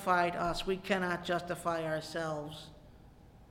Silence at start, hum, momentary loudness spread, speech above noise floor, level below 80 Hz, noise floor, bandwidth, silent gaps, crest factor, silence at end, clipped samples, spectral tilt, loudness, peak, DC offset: 0 s; none; 12 LU; 23 dB; -54 dBFS; -57 dBFS; 16.5 kHz; none; 20 dB; 0.05 s; under 0.1%; -5 dB/octave; -34 LUFS; -16 dBFS; under 0.1%